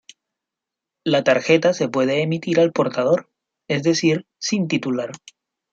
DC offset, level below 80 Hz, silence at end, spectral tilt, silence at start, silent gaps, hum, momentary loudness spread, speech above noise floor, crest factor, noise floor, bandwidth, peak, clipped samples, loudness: under 0.1%; -66 dBFS; 0.55 s; -5 dB/octave; 1.05 s; none; none; 8 LU; 66 dB; 18 dB; -86 dBFS; 7.8 kHz; -2 dBFS; under 0.1%; -20 LUFS